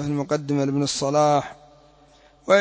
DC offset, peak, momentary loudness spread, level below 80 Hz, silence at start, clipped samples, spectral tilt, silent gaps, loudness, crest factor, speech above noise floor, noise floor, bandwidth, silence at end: under 0.1%; -4 dBFS; 11 LU; -58 dBFS; 0 s; under 0.1%; -5 dB/octave; none; -22 LUFS; 18 dB; 32 dB; -54 dBFS; 8 kHz; 0 s